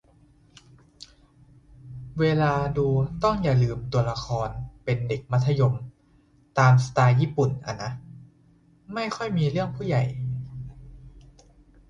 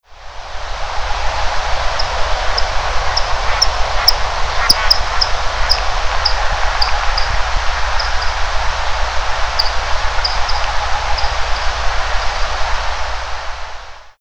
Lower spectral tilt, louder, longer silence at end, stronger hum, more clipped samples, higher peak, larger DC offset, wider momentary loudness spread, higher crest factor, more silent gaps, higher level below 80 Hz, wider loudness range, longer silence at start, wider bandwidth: first, -7.5 dB/octave vs -1.5 dB/octave; second, -25 LUFS vs -17 LUFS; first, 0.7 s vs 0 s; neither; neither; second, -6 dBFS vs 0 dBFS; second, under 0.1% vs 10%; first, 15 LU vs 11 LU; about the same, 18 dB vs 16 dB; neither; second, -48 dBFS vs -22 dBFS; about the same, 6 LU vs 5 LU; first, 1.85 s vs 0 s; second, 7.6 kHz vs over 20 kHz